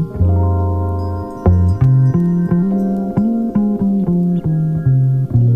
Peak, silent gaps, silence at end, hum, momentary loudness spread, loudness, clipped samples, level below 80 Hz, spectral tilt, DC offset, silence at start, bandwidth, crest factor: -2 dBFS; none; 0 s; none; 5 LU; -15 LUFS; under 0.1%; -30 dBFS; -12 dB/octave; under 0.1%; 0 s; 2.4 kHz; 12 dB